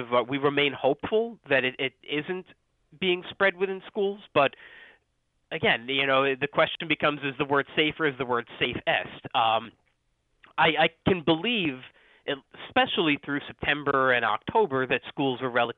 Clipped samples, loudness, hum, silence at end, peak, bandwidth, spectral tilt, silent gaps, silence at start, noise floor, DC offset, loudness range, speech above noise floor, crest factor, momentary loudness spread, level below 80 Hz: under 0.1%; -26 LUFS; none; 0.05 s; -8 dBFS; 4.4 kHz; -8 dB/octave; none; 0 s; -73 dBFS; under 0.1%; 3 LU; 47 dB; 20 dB; 8 LU; -60 dBFS